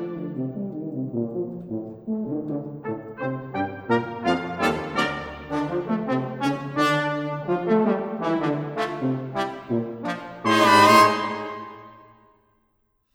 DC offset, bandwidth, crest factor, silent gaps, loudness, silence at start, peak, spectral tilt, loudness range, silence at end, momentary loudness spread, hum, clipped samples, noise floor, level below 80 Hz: under 0.1%; over 20 kHz; 22 dB; none; -24 LUFS; 0 s; -2 dBFS; -5 dB/octave; 8 LU; 1.15 s; 13 LU; none; under 0.1%; -69 dBFS; -58 dBFS